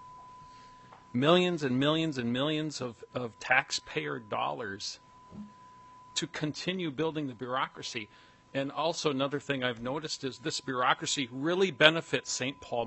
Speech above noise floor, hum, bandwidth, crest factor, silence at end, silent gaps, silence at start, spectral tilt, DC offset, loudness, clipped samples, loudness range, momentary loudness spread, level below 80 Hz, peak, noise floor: 23 dB; none; 8.6 kHz; 30 dB; 0 s; none; 0 s; -4 dB/octave; under 0.1%; -31 LUFS; under 0.1%; 7 LU; 14 LU; -70 dBFS; -2 dBFS; -54 dBFS